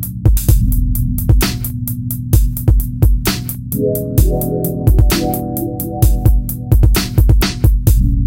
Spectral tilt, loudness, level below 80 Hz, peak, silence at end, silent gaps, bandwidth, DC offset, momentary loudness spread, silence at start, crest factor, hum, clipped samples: -6 dB/octave; -15 LUFS; -16 dBFS; -2 dBFS; 0 s; none; 17.5 kHz; under 0.1%; 8 LU; 0 s; 12 dB; none; under 0.1%